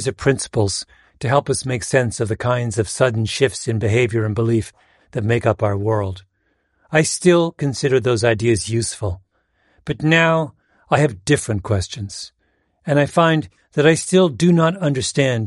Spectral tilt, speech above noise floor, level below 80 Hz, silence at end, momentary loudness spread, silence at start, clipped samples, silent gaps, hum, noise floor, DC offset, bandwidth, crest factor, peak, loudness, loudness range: -5.5 dB/octave; 48 dB; -48 dBFS; 0 s; 13 LU; 0 s; under 0.1%; none; none; -66 dBFS; under 0.1%; 11.5 kHz; 18 dB; -2 dBFS; -18 LUFS; 2 LU